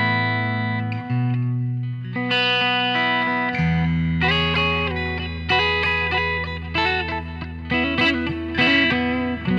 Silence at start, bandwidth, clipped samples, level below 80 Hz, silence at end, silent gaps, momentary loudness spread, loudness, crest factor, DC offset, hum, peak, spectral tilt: 0 s; 7.6 kHz; under 0.1%; -38 dBFS; 0 s; none; 8 LU; -20 LUFS; 16 dB; under 0.1%; none; -6 dBFS; -6.5 dB/octave